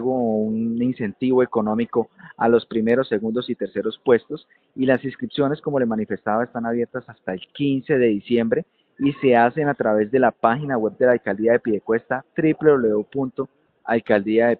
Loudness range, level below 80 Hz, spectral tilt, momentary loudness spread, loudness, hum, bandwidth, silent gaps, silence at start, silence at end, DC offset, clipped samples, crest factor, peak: 3 LU; -60 dBFS; -10 dB/octave; 9 LU; -21 LUFS; none; 4.5 kHz; none; 0 s; 0 s; under 0.1%; under 0.1%; 20 dB; -2 dBFS